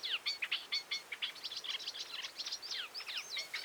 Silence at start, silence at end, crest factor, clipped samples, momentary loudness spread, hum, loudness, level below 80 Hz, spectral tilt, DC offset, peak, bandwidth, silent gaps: 0 s; 0 s; 18 dB; under 0.1%; 5 LU; none; -39 LUFS; -88 dBFS; 2 dB/octave; under 0.1%; -24 dBFS; over 20 kHz; none